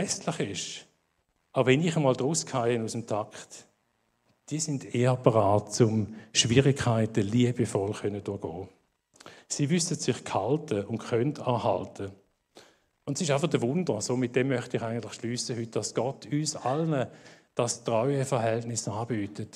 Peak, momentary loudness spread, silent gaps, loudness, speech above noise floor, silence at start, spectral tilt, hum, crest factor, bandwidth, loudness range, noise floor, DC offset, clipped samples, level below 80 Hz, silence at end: -6 dBFS; 12 LU; none; -28 LUFS; 46 dB; 0 s; -5 dB/octave; none; 24 dB; 13 kHz; 5 LU; -74 dBFS; under 0.1%; under 0.1%; -64 dBFS; 0.1 s